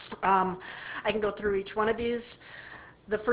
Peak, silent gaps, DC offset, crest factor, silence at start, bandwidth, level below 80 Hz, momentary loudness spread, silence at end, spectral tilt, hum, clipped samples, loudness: -12 dBFS; none; under 0.1%; 18 dB; 0 s; 4 kHz; -56 dBFS; 20 LU; 0 s; -3 dB/octave; none; under 0.1%; -30 LUFS